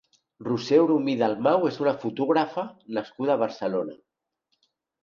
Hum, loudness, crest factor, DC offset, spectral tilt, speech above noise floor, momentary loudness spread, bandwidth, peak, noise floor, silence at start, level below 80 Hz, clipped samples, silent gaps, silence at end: none; -25 LUFS; 18 dB; under 0.1%; -7 dB/octave; 53 dB; 12 LU; 7.2 kHz; -8 dBFS; -77 dBFS; 0.4 s; -72 dBFS; under 0.1%; none; 1.1 s